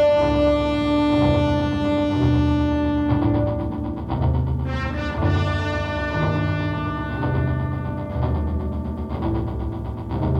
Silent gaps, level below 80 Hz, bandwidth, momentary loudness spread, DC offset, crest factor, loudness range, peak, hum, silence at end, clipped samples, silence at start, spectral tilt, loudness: none; -30 dBFS; 8.4 kHz; 9 LU; under 0.1%; 12 dB; 5 LU; -8 dBFS; none; 0 s; under 0.1%; 0 s; -8.5 dB/octave; -22 LUFS